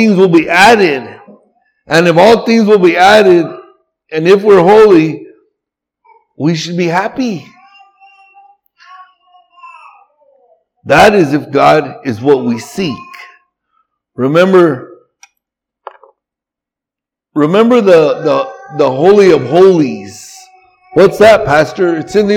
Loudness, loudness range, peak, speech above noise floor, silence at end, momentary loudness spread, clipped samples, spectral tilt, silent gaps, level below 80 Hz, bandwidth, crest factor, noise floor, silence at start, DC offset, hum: -9 LUFS; 11 LU; 0 dBFS; 76 dB; 0 s; 14 LU; 0.9%; -6 dB/octave; none; -46 dBFS; 16.5 kHz; 10 dB; -84 dBFS; 0 s; under 0.1%; none